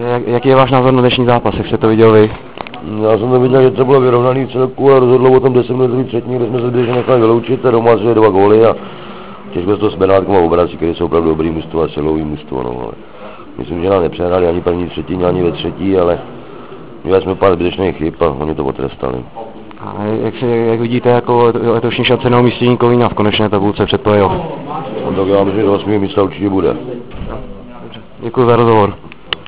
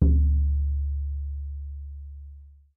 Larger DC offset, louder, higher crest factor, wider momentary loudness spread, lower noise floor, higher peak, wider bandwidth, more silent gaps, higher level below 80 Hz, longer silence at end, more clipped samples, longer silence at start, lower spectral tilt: first, 2% vs under 0.1%; first, -12 LUFS vs -27 LUFS; second, 12 dB vs 18 dB; about the same, 18 LU vs 20 LU; second, -32 dBFS vs -47 dBFS; first, 0 dBFS vs -8 dBFS; first, 4 kHz vs 1 kHz; neither; second, -36 dBFS vs -26 dBFS; second, 0.05 s vs 0.25 s; first, 0.3% vs under 0.1%; about the same, 0 s vs 0 s; second, -11 dB/octave vs -14.5 dB/octave